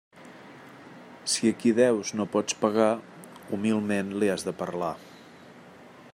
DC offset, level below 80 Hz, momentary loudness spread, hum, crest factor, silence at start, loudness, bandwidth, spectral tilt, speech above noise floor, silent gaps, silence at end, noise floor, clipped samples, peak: under 0.1%; -72 dBFS; 24 LU; none; 20 dB; 0.15 s; -27 LUFS; 16 kHz; -4.5 dB/octave; 24 dB; none; 0.05 s; -50 dBFS; under 0.1%; -8 dBFS